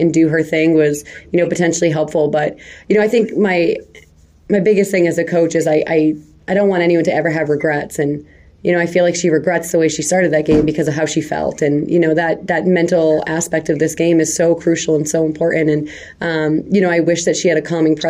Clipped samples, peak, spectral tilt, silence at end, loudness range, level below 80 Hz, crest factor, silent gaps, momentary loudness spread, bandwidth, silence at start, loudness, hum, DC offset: under 0.1%; -2 dBFS; -5.5 dB/octave; 0 s; 1 LU; -46 dBFS; 12 dB; none; 6 LU; 15.5 kHz; 0 s; -15 LUFS; none; under 0.1%